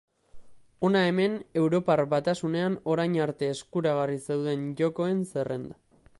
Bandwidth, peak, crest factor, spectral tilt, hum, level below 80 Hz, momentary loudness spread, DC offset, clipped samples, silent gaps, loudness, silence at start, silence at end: 11.5 kHz; -10 dBFS; 18 dB; -6.5 dB/octave; none; -66 dBFS; 7 LU; under 0.1%; under 0.1%; none; -27 LUFS; 0.35 s; 0.45 s